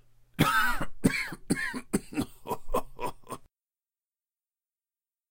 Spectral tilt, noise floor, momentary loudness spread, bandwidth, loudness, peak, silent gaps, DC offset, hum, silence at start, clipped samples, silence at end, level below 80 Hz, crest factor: -4.5 dB/octave; under -90 dBFS; 18 LU; 16 kHz; -30 LUFS; -10 dBFS; none; under 0.1%; none; 0.4 s; under 0.1%; 1.85 s; -44 dBFS; 22 dB